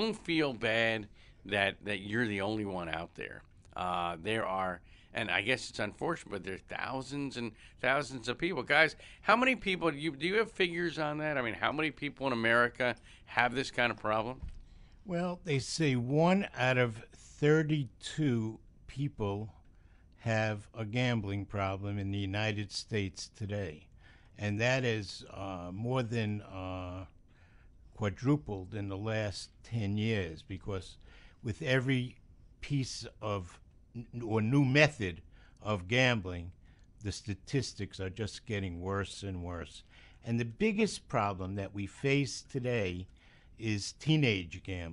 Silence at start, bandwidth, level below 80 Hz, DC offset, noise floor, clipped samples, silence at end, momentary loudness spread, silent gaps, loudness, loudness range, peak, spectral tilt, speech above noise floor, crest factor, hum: 0 s; 11 kHz; -58 dBFS; under 0.1%; -59 dBFS; under 0.1%; 0 s; 15 LU; none; -33 LUFS; 6 LU; -8 dBFS; -5.5 dB/octave; 26 dB; 26 dB; none